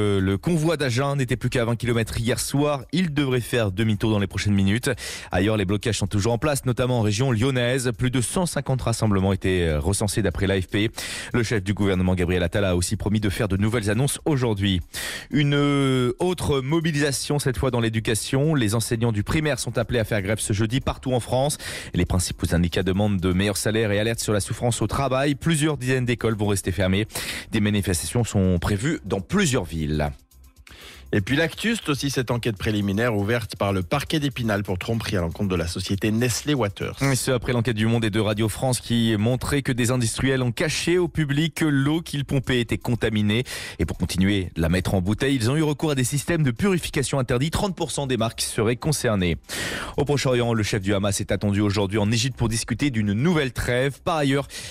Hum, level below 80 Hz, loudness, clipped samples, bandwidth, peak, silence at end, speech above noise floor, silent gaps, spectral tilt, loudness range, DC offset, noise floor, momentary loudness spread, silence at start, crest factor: none; -40 dBFS; -23 LUFS; under 0.1%; 16 kHz; -12 dBFS; 0 s; 26 dB; none; -5 dB/octave; 2 LU; under 0.1%; -48 dBFS; 4 LU; 0 s; 12 dB